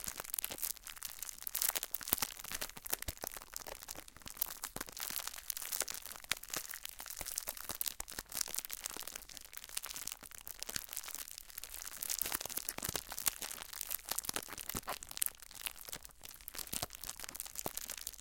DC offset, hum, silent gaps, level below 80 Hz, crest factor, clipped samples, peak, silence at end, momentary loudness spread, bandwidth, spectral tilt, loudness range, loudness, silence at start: under 0.1%; none; none; -62 dBFS; 38 dB; under 0.1%; -6 dBFS; 0 s; 10 LU; 17 kHz; -0.5 dB/octave; 4 LU; -40 LUFS; 0 s